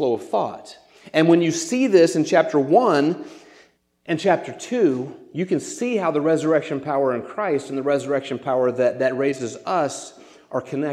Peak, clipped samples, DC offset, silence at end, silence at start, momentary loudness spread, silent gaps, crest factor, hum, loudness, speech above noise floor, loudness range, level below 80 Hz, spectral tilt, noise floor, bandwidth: -2 dBFS; under 0.1%; under 0.1%; 0 s; 0 s; 12 LU; none; 18 dB; none; -21 LUFS; 35 dB; 4 LU; -72 dBFS; -5.5 dB/octave; -55 dBFS; 12.5 kHz